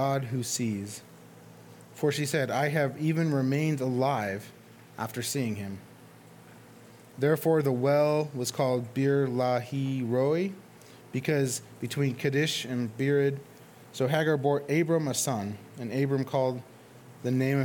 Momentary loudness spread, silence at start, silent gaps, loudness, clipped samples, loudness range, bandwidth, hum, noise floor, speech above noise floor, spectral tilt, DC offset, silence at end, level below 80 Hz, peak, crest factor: 13 LU; 0 s; none; -28 LUFS; under 0.1%; 4 LU; 19 kHz; none; -52 dBFS; 24 dB; -5.5 dB/octave; under 0.1%; 0 s; -74 dBFS; -10 dBFS; 18 dB